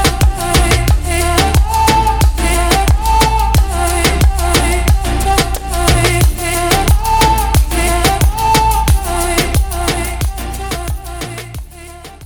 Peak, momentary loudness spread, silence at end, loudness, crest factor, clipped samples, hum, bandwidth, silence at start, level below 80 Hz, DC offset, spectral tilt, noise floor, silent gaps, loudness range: 0 dBFS; 10 LU; 0 s; -13 LUFS; 12 dB; under 0.1%; none; 19.5 kHz; 0 s; -16 dBFS; under 0.1%; -4 dB/octave; -32 dBFS; none; 3 LU